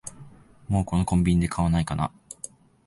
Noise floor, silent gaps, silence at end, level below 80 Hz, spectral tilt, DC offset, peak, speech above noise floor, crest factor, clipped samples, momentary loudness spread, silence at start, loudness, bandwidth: -48 dBFS; none; 0.8 s; -38 dBFS; -6.5 dB/octave; under 0.1%; -10 dBFS; 25 dB; 16 dB; under 0.1%; 17 LU; 0.05 s; -25 LUFS; 11.5 kHz